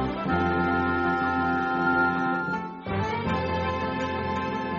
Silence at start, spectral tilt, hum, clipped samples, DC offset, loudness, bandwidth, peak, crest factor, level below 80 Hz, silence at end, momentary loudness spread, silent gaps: 0 s; -5 dB/octave; none; under 0.1%; under 0.1%; -26 LUFS; 7.4 kHz; -12 dBFS; 14 dB; -50 dBFS; 0 s; 5 LU; none